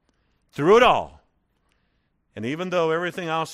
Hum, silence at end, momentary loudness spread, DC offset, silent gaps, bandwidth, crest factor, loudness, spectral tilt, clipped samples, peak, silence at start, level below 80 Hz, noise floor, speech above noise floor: none; 0 s; 18 LU; under 0.1%; none; 13.5 kHz; 20 dB; -21 LUFS; -5 dB/octave; under 0.1%; -4 dBFS; 0.55 s; -54 dBFS; -69 dBFS; 49 dB